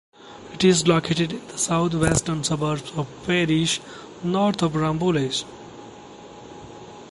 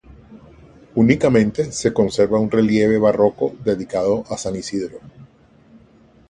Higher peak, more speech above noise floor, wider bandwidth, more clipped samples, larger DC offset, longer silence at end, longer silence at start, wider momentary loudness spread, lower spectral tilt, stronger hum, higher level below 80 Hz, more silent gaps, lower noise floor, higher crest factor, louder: about the same, -4 dBFS vs -2 dBFS; second, 20 dB vs 33 dB; about the same, 11.5 kHz vs 11 kHz; neither; neither; second, 0 s vs 1.05 s; about the same, 0.2 s vs 0.1 s; first, 22 LU vs 10 LU; second, -4.5 dB/octave vs -6 dB/octave; neither; about the same, -48 dBFS vs -48 dBFS; neither; second, -42 dBFS vs -50 dBFS; about the same, 20 dB vs 18 dB; second, -22 LUFS vs -18 LUFS